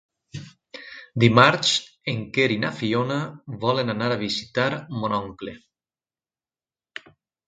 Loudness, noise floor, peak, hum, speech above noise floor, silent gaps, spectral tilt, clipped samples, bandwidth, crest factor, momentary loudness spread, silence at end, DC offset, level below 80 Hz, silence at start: -22 LUFS; under -90 dBFS; 0 dBFS; none; over 68 dB; none; -5 dB/octave; under 0.1%; 9.4 kHz; 24 dB; 24 LU; 1.9 s; under 0.1%; -58 dBFS; 0.35 s